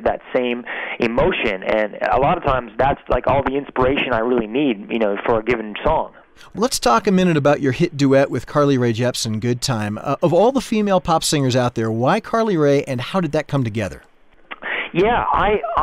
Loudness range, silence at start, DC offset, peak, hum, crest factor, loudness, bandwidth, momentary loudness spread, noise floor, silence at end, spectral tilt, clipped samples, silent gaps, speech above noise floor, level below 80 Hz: 3 LU; 0 s; under 0.1%; -6 dBFS; none; 12 dB; -18 LUFS; 15.5 kHz; 7 LU; -39 dBFS; 0 s; -5.5 dB/octave; under 0.1%; none; 21 dB; -38 dBFS